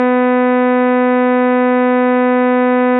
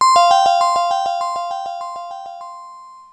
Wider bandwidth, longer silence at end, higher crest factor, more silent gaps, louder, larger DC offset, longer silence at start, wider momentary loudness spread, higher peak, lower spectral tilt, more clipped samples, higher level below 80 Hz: second, 4 kHz vs 11 kHz; about the same, 0 s vs 0.1 s; second, 6 dB vs 14 dB; neither; first, -12 LUFS vs -16 LUFS; neither; about the same, 0 s vs 0 s; second, 0 LU vs 22 LU; second, -6 dBFS vs -2 dBFS; first, -3 dB/octave vs 0 dB/octave; neither; second, -82 dBFS vs -64 dBFS